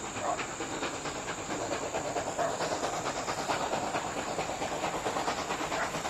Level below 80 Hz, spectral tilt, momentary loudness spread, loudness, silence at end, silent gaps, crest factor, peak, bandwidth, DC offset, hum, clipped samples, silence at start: -56 dBFS; -3 dB/octave; 3 LU; -33 LUFS; 0 s; none; 18 dB; -16 dBFS; 16 kHz; under 0.1%; none; under 0.1%; 0 s